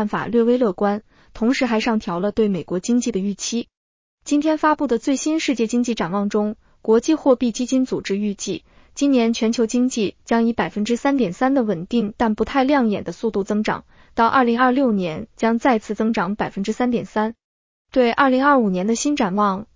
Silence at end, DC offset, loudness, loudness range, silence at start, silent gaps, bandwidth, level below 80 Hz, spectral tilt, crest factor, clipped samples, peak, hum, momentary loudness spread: 0.1 s; under 0.1%; -20 LUFS; 2 LU; 0 s; 3.77-4.18 s, 17.44-17.85 s; 7.6 kHz; -52 dBFS; -5 dB/octave; 16 dB; under 0.1%; -4 dBFS; none; 8 LU